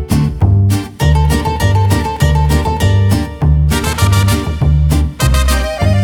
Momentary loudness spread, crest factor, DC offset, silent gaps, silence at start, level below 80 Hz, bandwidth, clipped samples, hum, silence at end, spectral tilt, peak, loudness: 3 LU; 10 dB; under 0.1%; none; 0 s; -16 dBFS; 18 kHz; under 0.1%; none; 0 s; -6 dB/octave; 0 dBFS; -13 LUFS